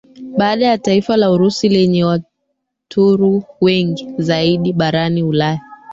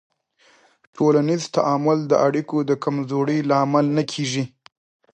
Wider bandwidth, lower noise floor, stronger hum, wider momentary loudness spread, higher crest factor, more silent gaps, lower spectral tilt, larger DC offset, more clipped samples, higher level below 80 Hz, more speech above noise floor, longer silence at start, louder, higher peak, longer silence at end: second, 7.8 kHz vs 9.2 kHz; first, -72 dBFS vs -58 dBFS; neither; about the same, 8 LU vs 6 LU; about the same, 14 dB vs 18 dB; neither; about the same, -6.5 dB/octave vs -6 dB/octave; neither; neither; first, -52 dBFS vs -70 dBFS; first, 58 dB vs 38 dB; second, 0.15 s vs 0.95 s; first, -15 LUFS vs -20 LUFS; about the same, -2 dBFS vs -4 dBFS; second, 0 s vs 0.65 s